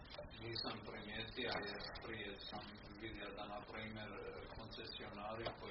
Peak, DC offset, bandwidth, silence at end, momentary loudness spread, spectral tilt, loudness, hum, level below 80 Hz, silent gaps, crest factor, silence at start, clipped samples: -30 dBFS; under 0.1%; 5.8 kHz; 0 s; 8 LU; -2.5 dB/octave; -48 LUFS; none; -62 dBFS; none; 20 dB; 0 s; under 0.1%